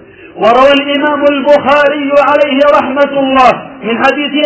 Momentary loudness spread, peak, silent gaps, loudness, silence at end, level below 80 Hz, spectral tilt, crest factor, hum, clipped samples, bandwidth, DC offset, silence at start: 5 LU; 0 dBFS; none; -8 LUFS; 0 s; -44 dBFS; -5 dB/octave; 8 dB; none; 3%; 8 kHz; under 0.1%; 0.2 s